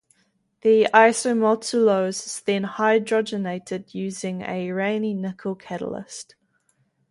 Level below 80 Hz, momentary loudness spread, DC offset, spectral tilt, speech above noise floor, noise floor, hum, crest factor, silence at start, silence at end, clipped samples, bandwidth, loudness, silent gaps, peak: -68 dBFS; 15 LU; under 0.1%; -4.5 dB/octave; 46 dB; -67 dBFS; none; 22 dB; 0.65 s; 0.9 s; under 0.1%; 11.5 kHz; -22 LUFS; none; -2 dBFS